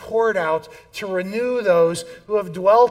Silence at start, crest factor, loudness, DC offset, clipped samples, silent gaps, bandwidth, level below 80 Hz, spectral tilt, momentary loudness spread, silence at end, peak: 0 s; 16 dB; -20 LUFS; under 0.1%; under 0.1%; none; 15 kHz; -58 dBFS; -5 dB/octave; 11 LU; 0 s; -4 dBFS